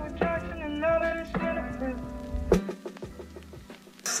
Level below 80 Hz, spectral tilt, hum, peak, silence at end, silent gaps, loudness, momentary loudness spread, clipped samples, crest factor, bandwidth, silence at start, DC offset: -42 dBFS; -4.5 dB/octave; none; -8 dBFS; 0 s; none; -30 LUFS; 18 LU; under 0.1%; 22 dB; 15 kHz; 0 s; under 0.1%